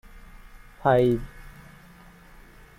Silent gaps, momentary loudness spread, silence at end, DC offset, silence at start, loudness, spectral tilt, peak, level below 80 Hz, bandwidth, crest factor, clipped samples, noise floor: none; 27 LU; 1.3 s; under 0.1%; 0.15 s; -23 LUFS; -8 dB/octave; -8 dBFS; -46 dBFS; 16 kHz; 22 dB; under 0.1%; -50 dBFS